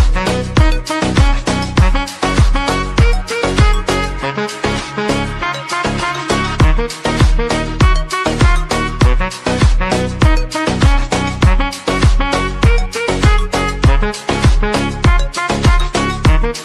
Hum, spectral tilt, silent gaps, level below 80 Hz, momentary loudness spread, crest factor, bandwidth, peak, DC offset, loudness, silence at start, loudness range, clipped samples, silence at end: none; -5.5 dB/octave; none; -16 dBFS; 4 LU; 12 dB; 12 kHz; 0 dBFS; under 0.1%; -15 LUFS; 0 s; 2 LU; under 0.1%; 0 s